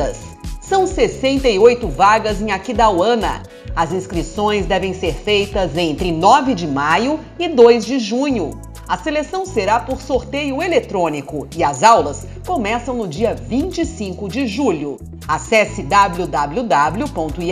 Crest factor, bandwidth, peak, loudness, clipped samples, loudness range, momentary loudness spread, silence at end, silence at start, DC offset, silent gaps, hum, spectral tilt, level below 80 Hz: 16 dB; 14.5 kHz; 0 dBFS; -17 LUFS; under 0.1%; 4 LU; 12 LU; 0 s; 0 s; under 0.1%; none; none; -5 dB/octave; -34 dBFS